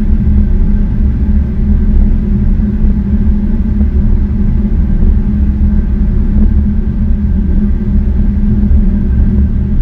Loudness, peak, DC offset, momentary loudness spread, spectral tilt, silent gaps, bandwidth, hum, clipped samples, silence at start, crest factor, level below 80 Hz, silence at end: -13 LUFS; 0 dBFS; under 0.1%; 2 LU; -11.5 dB/octave; none; 2.6 kHz; none; 0.4%; 0 s; 8 dB; -10 dBFS; 0 s